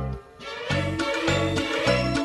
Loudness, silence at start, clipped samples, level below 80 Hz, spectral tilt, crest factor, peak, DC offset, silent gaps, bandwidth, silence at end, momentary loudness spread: -25 LUFS; 0 s; under 0.1%; -42 dBFS; -5 dB/octave; 16 dB; -8 dBFS; under 0.1%; none; 12 kHz; 0 s; 12 LU